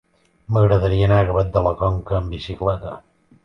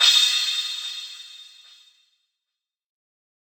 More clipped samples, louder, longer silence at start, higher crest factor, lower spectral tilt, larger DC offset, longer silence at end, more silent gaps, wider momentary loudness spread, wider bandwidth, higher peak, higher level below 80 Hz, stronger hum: neither; about the same, -19 LUFS vs -20 LUFS; first, 0.5 s vs 0 s; second, 16 dB vs 22 dB; first, -9 dB/octave vs 8.5 dB/octave; neither; second, 0.45 s vs 2 s; neither; second, 12 LU vs 25 LU; second, 6 kHz vs over 20 kHz; about the same, -4 dBFS vs -4 dBFS; first, -32 dBFS vs under -90 dBFS; neither